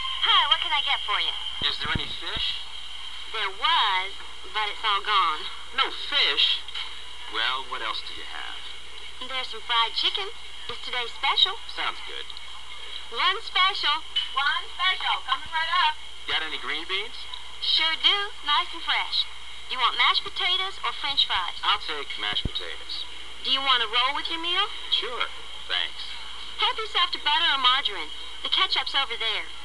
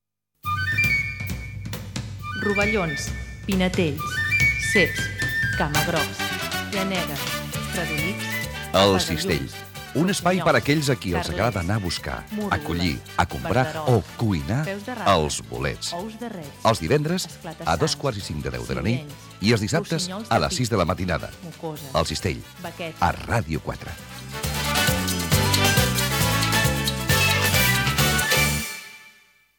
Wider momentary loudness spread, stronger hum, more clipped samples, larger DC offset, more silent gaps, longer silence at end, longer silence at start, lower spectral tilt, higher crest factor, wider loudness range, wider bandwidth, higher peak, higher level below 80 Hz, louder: about the same, 15 LU vs 14 LU; neither; neither; first, 2% vs under 0.1%; neither; second, 0 s vs 0.5 s; second, 0 s vs 0.45 s; second, -1.5 dB/octave vs -4 dB/octave; about the same, 22 dB vs 18 dB; about the same, 3 LU vs 5 LU; second, 12.5 kHz vs 18 kHz; about the same, -6 dBFS vs -4 dBFS; second, -52 dBFS vs -40 dBFS; about the same, -24 LUFS vs -23 LUFS